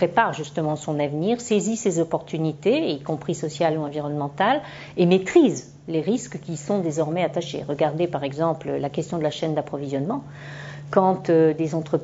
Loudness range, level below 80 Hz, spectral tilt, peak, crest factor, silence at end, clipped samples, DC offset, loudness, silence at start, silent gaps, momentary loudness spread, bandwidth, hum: 3 LU; -60 dBFS; -6 dB/octave; -2 dBFS; 20 dB; 0 s; under 0.1%; under 0.1%; -23 LUFS; 0 s; none; 10 LU; 8 kHz; none